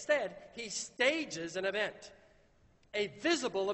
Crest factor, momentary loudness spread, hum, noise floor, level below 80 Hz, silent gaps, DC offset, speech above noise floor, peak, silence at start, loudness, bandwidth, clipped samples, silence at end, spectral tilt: 20 dB; 12 LU; none; -66 dBFS; -72 dBFS; none; under 0.1%; 32 dB; -16 dBFS; 0 s; -35 LUFS; 8.4 kHz; under 0.1%; 0 s; -2.5 dB/octave